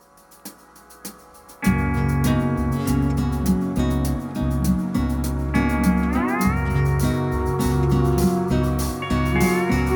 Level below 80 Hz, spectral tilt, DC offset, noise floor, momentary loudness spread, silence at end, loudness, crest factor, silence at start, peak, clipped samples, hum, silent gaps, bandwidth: -28 dBFS; -6.5 dB/octave; under 0.1%; -47 dBFS; 6 LU; 0 s; -21 LUFS; 14 dB; 0.45 s; -6 dBFS; under 0.1%; none; none; 19 kHz